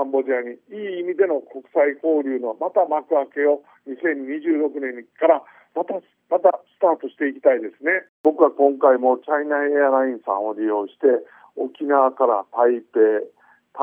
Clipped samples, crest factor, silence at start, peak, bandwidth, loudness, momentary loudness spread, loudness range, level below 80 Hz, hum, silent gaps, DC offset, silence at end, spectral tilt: under 0.1%; 20 dB; 0 s; 0 dBFS; 3.6 kHz; -21 LUFS; 11 LU; 3 LU; under -90 dBFS; none; 8.09-8.24 s; under 0.1%; 0 s; -8 dB/octave